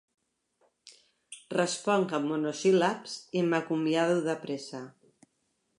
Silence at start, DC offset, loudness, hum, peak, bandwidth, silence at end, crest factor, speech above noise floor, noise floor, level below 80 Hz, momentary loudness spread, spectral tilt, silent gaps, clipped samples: 0.85 s; under 0.1%; -29 LUFS; none; -12 dBFS; 11.5 kHz; 0.9 s; 18 dB; 48 dB; -77 dBFS; -82 dBFS; 17 LU; -5 dB/octave; none; under 0.1%